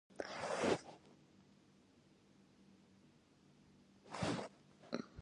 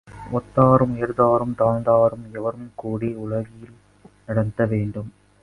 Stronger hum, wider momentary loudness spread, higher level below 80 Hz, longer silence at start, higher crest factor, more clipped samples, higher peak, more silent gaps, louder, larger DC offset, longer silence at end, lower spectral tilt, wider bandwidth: neither; first, 27 LU vs 13 LU; second, -74 dBFS vs -48 dBFS; about the same, 0.1 s vs 0.1 s; about the same, 24 dB vs 20 dB; neither; second, -22 dBFS vs 0 dBFS; neither; second, -43 LUFS vs -21 LUFS; neither; second, 0 s vs 0.35 s; second, -4.5 dB/octave vs -10.5 dB/octave; about the same, 11 kHz vs 11 kHz